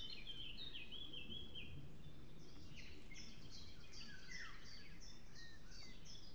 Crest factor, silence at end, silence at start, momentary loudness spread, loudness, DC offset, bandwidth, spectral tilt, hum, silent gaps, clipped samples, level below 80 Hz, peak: 16 dB; 0 s; 0 s; 9 LU; -55 LUFS; 0.4%; over 20 kHz; -3 dB/octave; none; none; under 0.1%; -64 dBFS; -38 dBFS